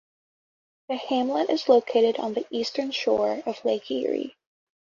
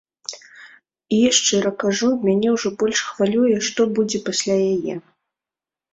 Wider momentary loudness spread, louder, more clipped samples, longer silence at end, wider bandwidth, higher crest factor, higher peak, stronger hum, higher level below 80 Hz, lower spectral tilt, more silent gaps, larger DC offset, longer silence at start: second, 9 LU vs 15 LU; second, -25 LUFS vs -19 LUFS; neither; second, 0.6 s vs 0.95 s; second, 7.4 kHz vs 8.4 kHz; about the same, 20 dB vs 18 dB; second, -6 dBFS vs -2 dBFS; neither; second, -70 dBFS vs -62 dBFS; about the same, -4 dB/octave vs -3.5 dB/octave; neither; neither; first, 0.9 s vs 0.3 s